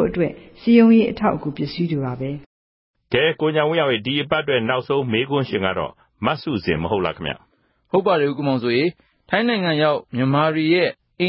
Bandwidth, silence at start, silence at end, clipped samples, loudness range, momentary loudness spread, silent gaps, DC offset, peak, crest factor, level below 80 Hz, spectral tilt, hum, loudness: 5.8 kHz; 0 s; 0 s; under 0.1%; 3 LU; 10 LU; 2.46-2.94 s; under 0.1%; -2 dBFS; 18 dB; -50 dBFS; -11 dB/octave; none; -20 LUFS